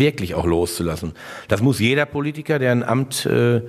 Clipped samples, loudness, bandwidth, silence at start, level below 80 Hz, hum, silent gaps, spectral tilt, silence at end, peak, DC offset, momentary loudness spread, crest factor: under 0.1%; -20 LUFS; 14 kHz; 0 s; -42 dBFS; none; none; -5.5 dB/octave; 0 s; -2 dBFS; under 0.1%; 8 LU; 18 dB